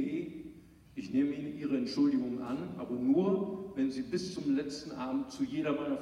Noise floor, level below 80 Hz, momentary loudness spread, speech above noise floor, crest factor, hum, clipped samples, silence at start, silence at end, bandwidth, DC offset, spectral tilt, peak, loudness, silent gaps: -54 dBFS; -66 dBFS; 10 LU; 22 dB; 14 dB; none; under 0.1%; 0 s; 0 s; 11 kHz; under 0.1%; -6.5 dB/octave; -18 dBFS; -34 LUFS; none